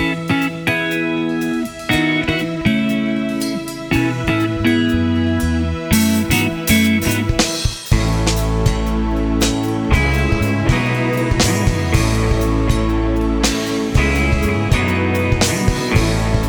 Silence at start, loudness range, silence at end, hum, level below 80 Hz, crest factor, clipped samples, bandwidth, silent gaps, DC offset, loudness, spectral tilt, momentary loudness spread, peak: 0 s; 2 LU; 0 s; none; -24 dBFS; 16 dB; under 0.1%; over 20 kHz; none; under 0.1%; -17 LUFS; -5 dB/octave; 4 LU; 0 dBFS